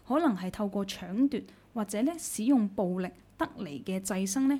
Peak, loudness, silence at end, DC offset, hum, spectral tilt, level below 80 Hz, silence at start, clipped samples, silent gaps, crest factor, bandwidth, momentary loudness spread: -16 dBFS; -31 LUFS; 0 s; under 0.1%; none; -5 dB/octave; -62 dBFS; 0.05 s; under 0.1%; none; 14 dB; 16.5 kHz; 10 LU